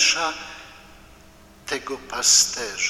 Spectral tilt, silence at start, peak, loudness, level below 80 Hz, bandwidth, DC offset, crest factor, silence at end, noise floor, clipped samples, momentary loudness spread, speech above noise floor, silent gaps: 1.5 dB/octave; 0 s; -4 dBFS; -19 LUFS; -54 dBFS; 17 kHz; under 0.1%; 20 dB; 0 s; -49 dBFS; under 0.1%; 23 LU; 26 dB; none